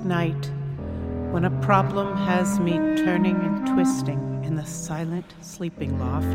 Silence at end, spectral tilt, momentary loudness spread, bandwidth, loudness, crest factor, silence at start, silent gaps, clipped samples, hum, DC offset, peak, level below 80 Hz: 0 s; -6.5 dB/octave; 11 LU; 16 kHz; -24 LUFS; 20 dB; 0 s; none; under 0.1%; none; under 0.1%; -4 dBFS; -44 dBFS